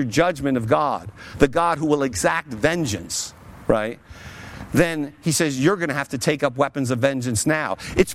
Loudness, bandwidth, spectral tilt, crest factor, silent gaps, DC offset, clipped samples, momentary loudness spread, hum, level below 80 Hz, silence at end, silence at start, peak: -22 LUFS; 16.5 kHz; -4.5 dB/octave; 20 dB; none; under 0.1%; under 0.1%; 11 LU; none; -44 dBFS; 0 s; 0 s; -2 dBFS